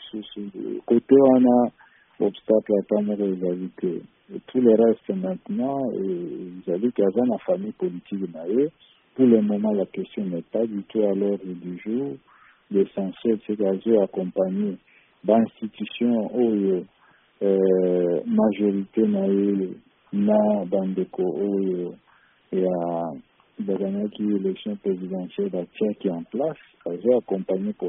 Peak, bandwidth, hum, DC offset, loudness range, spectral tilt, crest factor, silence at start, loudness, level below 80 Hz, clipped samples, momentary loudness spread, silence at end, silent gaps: -4 dBFS; 3.8 kHz; none; under 0.1%; 5 LU; -7.5 dB/octave; 20 dB; 0 s; -24 LUFS; -68 dBFS; under 0.1%; 13 LU; 0 s; none